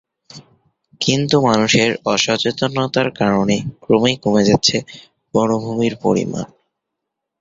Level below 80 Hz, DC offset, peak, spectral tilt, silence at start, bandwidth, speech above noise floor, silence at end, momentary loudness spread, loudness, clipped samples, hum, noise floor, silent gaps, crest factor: -50 dBFS; under 0.1%; 0 dBFS; -4.5 dB/octave; 0.35 s; 7.8 kHz; 63 dB; 0.95 s; 8 LU; -17 LUFS; under 0.1%; none; -79 dBFS; none; 16 dB